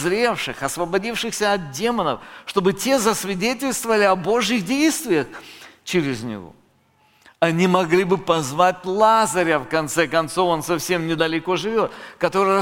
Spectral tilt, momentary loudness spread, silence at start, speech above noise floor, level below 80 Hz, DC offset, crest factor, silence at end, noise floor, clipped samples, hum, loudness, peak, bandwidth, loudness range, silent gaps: -4 dB/octave; 8 LU; 0 s; 39 dB; -52 dBFS; under 0.1%; 18 dB; 0 s; -59 dBFS; under 0.1%; none; -20 LUFS; -2 dBFS; 17 kHz; 4 LU; none